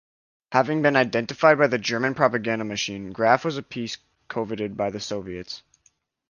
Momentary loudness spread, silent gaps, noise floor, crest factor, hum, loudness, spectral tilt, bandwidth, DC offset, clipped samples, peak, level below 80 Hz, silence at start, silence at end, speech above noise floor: 14 LU; none; -66 dBFS; 22 dB; none; -23 LUFS; -5 dB/octave; 7.2 kHz; under 0.1%; under 0.1%; -2 dBFS; -60 dBFS; 0.5 s; 0.7 s; 42 dB